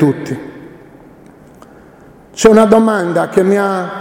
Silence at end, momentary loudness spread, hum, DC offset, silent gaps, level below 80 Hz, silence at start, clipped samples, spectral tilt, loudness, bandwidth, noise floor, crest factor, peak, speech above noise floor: 0 s; 18 LU; none; under 0.1%; none; -46 dBFS; 0 s; 0.3%; -6 dB/octave; -11 LUFS; 16 kHz; -41 dBFS; 14 dB; 0 dBFS; 29 dB